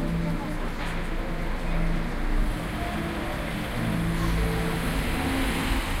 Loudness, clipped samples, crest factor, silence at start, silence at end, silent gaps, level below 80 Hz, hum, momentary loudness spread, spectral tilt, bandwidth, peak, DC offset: -29 LUFS; under 0.1%; 12 dB; 0 s; 0 s; none; -30 dBFS; none; 6 LU; -5.5 dB/octave; 16 kHz; -14 dBFS; under 0.1%